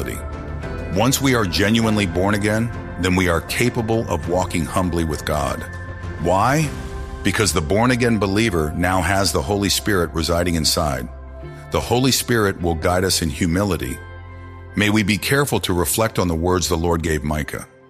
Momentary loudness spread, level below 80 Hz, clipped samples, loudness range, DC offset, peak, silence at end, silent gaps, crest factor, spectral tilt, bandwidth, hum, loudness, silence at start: 12 LU; -34 dBFS; under 0.1%; 3 LU; under 0.1%; -2 dBFS; 0.25 s; none; 18 dB; -4.5 dB/octave; 15.5 kHz; none; -19 LUFS; 0 s